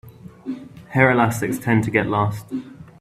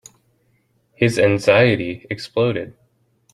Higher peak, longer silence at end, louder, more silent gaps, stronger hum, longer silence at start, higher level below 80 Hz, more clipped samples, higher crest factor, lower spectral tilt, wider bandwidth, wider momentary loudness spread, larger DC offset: about the same, -2 dBFS vs -2 dBFS; second, 0.1 s vs 0.6 s; about the same, -19 LUFS vs -18 LUFS; neither; neither; second, 0.05 s vs 1 s; about the same, -52 dBFS vs -56 dBFS; neither; about the same, 20 dB vs 18 dB; about the same, -6.5 dB/octave vs -6 dB/octave; first, 15.5 kHz vs 13 kHz; first, 17 LU vs 14 LU; neither